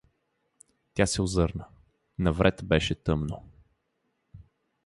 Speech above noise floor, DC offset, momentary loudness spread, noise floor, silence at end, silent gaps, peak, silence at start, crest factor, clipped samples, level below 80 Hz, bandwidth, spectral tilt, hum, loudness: 50 dB; under 0.1%; 15 LU; -77 dBFS; 0.5 s; none; -8 dBFS; 0.95 s; 22 dB; under 0.1%; -42 dBFS; 11.5 kHz; -5.5 dB/octave; none; -27 LUFS